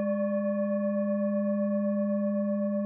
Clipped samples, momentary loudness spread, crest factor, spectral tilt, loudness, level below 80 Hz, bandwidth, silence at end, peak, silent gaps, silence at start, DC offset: under 0.1%; 1 LU; 8 dB; -12 dB/octave; -29 LUFS; -84 dBFS; 2.6 kHz; 0 s; -20 dBFS; none; 0 s; under 0.1%